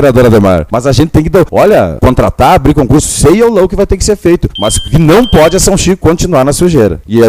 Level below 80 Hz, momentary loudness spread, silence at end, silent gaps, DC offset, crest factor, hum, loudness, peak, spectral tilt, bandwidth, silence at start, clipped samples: -20 dBFS; 4 LU; 0 s; none; under 0.1%; 6 dB; none; -7 LUFS; 0 dBFS; -5.5 dB/octave; 16.5 kHz; 0 s; 2%